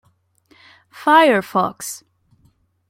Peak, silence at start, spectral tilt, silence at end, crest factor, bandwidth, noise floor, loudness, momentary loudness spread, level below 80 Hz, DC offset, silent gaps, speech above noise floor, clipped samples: -2 dBFS; 0.95 s; -4 dB/octave; 0.95 s; 18 dB; 16.5 kHz; -59 dBFS; -16 LUFS; 18 LU; -66 dBFS; under 0.1%; none; 43 dB; under 0.1%